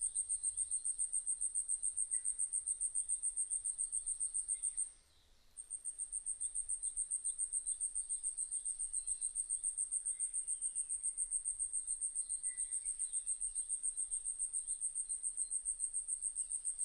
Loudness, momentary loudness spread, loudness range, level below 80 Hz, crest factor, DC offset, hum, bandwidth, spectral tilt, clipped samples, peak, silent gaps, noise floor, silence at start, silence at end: -37 LUFS; 3 LU; 3 LU; -66 dBFS; 16 dB; under 0.1%; none; 11 kHz; 2.5 dB/octave; under 0.1%; -24 dBFS; none; -67 dBFS; 0 s; 0 s